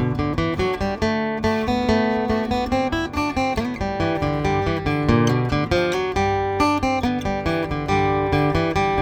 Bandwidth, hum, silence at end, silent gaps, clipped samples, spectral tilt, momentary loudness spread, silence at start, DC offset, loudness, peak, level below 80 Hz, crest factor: 17.5 kHz; none; 0 s; none; under 0.1%; -6.5 dB/octave; 4 LU; 0 s; under 0.1%; -21 LUFS; -4 dBFS; -36 dBFS; 16 dB